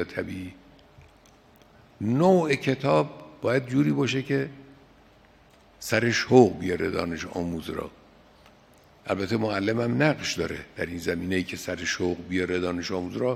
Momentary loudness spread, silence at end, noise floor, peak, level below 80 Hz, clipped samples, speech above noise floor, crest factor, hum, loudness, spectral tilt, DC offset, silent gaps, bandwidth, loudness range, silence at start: 13 LU; 0 s; -56 dBFS; -2 dBFS; -60 dBFS; under 0.1%; 31 dB; 24 dB; none; -26 LUFS; -5.5 dB/octave; under 0.1%; none; 15.5 kHz; 4 LU; 0 s